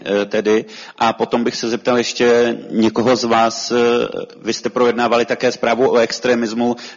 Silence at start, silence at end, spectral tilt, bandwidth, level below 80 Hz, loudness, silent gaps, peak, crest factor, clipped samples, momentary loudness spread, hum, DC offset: 0 s; 0 s; -4 dB/octave; 7.6 kHz; -56 dBFS; -16 LUFS; none; -2 dBFS; 14 dB; under 0.1%; 6 LU; none; under 0.1%